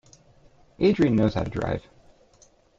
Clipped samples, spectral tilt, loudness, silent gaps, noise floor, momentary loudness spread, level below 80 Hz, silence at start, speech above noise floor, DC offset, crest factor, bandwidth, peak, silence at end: under 0.1%; -8 dB/octave; -24 LUFS; none; -58 dBFS; 10 LU; -48 dBFS; 0.8 s; 36 dB; under 0.1%; 18 dB; 7.8 kHz; -8 dBFS; 1 s